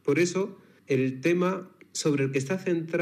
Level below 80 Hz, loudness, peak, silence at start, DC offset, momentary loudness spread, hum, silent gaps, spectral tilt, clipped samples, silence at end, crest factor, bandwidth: under -90 dBFS; -28 LUFS; -12 dBFS; 0.05 s; under 0.1%; 8 LU; none; none; -5.5 dB/octave; under 0.1%; 0 s; 16 dB; 15 kHz